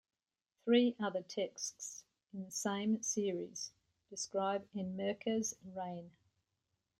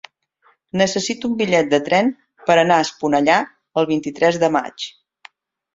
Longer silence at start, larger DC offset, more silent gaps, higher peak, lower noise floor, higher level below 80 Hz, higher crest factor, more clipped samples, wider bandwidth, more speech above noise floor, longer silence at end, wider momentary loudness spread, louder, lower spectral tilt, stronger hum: about the same, 0.65 s vs 0.75 s; neither; neither; second, -20 dBFS vs -2 dBFS; first, -86 dBFS vs -60 dBFS; second, -82 dBFS vs -60 dBFS; about the same, 20 dB vs 18 dB; neither; first, 13 kHz vs 7.8 kHz; first, 49 dB vs 42 dB; about the same, 0.9 s vs 0.85 s; first, 15 LU vs 10 LU; second, -38 LUFS vs -18 LUFS; about the same, -4 dB/octave vs -4.5 dB/octave; neither